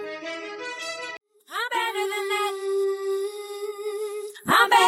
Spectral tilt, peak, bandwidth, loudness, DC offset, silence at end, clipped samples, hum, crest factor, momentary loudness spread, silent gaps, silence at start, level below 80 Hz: -2 dB/octave; -6 dBFS; 16.5 kHz; -27 LUFS; under 0.1%; 0 s; under 0.1%; none; 20 dB; 11 LU; none; 0 s; -72 dBFS